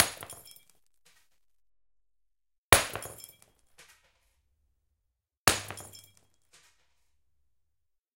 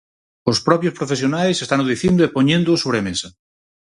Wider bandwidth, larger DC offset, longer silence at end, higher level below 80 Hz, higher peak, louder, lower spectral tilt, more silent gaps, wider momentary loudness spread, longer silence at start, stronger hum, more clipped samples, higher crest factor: first, 16.5 kHz vs 11.5 kHz; neither; first, 2.3 s vs 0.5 s; about the same, -52 dBFS vs -50 dBFS; about the same, 0 dBFS vs 0 dBFS; second, -26 LUFS vs -18 LUFS; second, -1.5 dB/octave vs -5 dB/octave; first, 2.58-2.72 s, 5.37-5.45 s vs none; first, 25 LU vs 9 LU; second, 0 s vs 0.45 s; neither; neither; first, 36 dB vs 18 dB